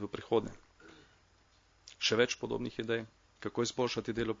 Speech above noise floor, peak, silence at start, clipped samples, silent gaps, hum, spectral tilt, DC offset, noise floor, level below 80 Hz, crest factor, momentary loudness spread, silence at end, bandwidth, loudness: 33 dB; -14 dBFS; 0 s; under 0.1%; none; none; -3 dB/octave; under 0.1%; -67 dBFS; -64 dBFS; 22 dB; 11 LU; 0.05 s; 7.4 kHz; -34 LUFS